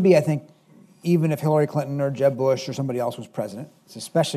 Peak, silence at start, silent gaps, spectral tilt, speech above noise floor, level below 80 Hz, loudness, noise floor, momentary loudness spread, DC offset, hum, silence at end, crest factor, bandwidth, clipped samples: -4 dBFS; 0 s; none; -7 dB/octave; 31 dB; -70 dBFS; -23 LUFS; -53 dBFS; 12 LU; under 0.1%; none; 0 s; 18 dB; 14 kHz; under 0.1%